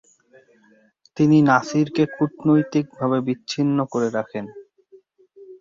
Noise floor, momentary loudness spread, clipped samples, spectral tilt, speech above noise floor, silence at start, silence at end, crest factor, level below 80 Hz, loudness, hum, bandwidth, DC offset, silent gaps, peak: -57 dBFS; 13 LU; under 0.1%; -7 dB/octave; 38 dB; 1.15 s; 0.05 s; 20 dB; -62 dBFS; -20 LUFS; none; 7.6 kHz; under 0.1%; none; -2 dBFS